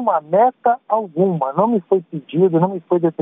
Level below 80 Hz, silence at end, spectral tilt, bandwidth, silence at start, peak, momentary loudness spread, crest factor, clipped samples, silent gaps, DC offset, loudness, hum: -68 dBFS; 0 s; -11 dB/octave; 3.8 kHz; 0 s; -4 dBFS; 5 LU; 14 dB; under 0.1%; none; under 0.1%; -18 LUFS; none